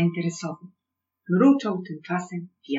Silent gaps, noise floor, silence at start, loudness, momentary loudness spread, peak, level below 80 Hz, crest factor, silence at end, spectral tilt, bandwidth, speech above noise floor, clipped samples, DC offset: none; -84 dBFS; 0 s; -24 LUFS; 17 LU; -8 dBFS; -90 dBFS; 18 dB; 0 s; -7 dB/octave; 8 kHz; 60 dB; under 0.1%; under 0.1%